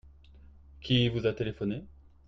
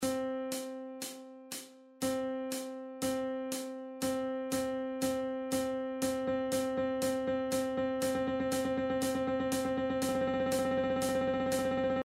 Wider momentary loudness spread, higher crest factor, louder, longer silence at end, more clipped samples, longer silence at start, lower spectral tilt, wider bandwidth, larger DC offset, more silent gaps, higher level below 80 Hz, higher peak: first, 13 LU vs 10 LU; about the same, 18 dB vs 14 dB; first, -30 LUFS vs -34 LUFS; first, 0.35 s vs 0 s; neither; about the same, 0.05 s vs 0 s; first, -7.5 dB/octave vs -4 dB/octave; second, 7 kHz vs 16 kHz; neither; neither; first, -52 dBFS vs -62 dBFS; first, -14 dBFS vs -20 dBFS